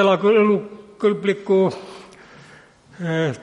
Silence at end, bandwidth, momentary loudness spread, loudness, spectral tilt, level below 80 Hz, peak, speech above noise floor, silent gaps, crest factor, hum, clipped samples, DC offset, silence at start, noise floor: 0 s; 10.5 kHz; 22 LU; -19 LUFS; -7 dB/octave; -66 dBFS; -4 dBFS; 30 dB; none; 16 dB; none; under 0.1%; under 0.1%; 0 s; -48 dBFS